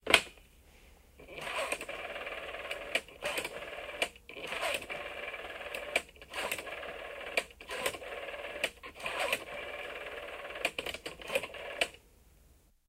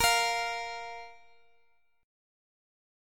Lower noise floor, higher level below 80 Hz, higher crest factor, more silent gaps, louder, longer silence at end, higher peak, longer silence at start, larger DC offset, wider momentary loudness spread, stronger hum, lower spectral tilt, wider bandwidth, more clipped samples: second, -64 dBFS vs -71 dBFS; about the same, -62 dBFS vs -58 dBFS; first, 34 dB vs 22 dB; neither; second, -37 LUFS vs -30 LUFS; second, 0.3 s vs 1.9 s; first, -4 dBFS vs -12 dBFS; about the same, 0.05 s vs 0 s; neither; second, 8 LU vs 20 LU; neither; first, -1 dB/octave vs 0.5 dB/octave; about the same, 16 kHz vs 17.5 kHz; neither